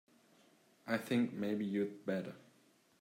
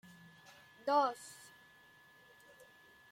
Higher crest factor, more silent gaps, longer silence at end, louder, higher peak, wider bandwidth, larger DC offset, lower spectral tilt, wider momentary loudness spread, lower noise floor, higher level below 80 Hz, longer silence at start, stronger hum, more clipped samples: about the same, 18 dB vs 22 dB; neither; second, 0.65 s vs 1.75 s; about the same, -38 LUFS vs -36 LUFS; about the same, -22 dBFS vs -20 dBFS; about the same, 16 kHz vs 16.5 kHz; neither; first, -6.5 dB/octave vs -3.5 dB/octave; second, 16 LU vs 28 LU; first, -70 dBFS vs -63 dBFS; about the same, -86 dBFS vs -86 dBFS; about the same, 0.85 s vs 0.85 s; neither; neither